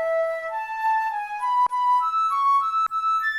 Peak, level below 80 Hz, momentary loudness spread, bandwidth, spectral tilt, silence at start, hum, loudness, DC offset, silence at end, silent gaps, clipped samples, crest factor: -14 dBFS; -66 dBFS; 7 LU; 15 kHz; -0.5 dB/octave; 0 s; none; -22 LUFS; under 0.1%; 0 s; none; under 0.1%; 10 dB